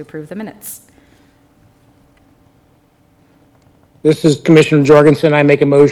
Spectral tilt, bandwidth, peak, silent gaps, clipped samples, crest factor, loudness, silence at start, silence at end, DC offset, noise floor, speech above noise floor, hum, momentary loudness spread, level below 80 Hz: -6.5 dB/octave; 19 kHz; 0 dBFS; none; under 0.1%; 14 dB; -10 LUFS; 0 s; 0 s; under 0.1%; -52 dBFS; 42 dB; none; 21 LU; -52 dBFS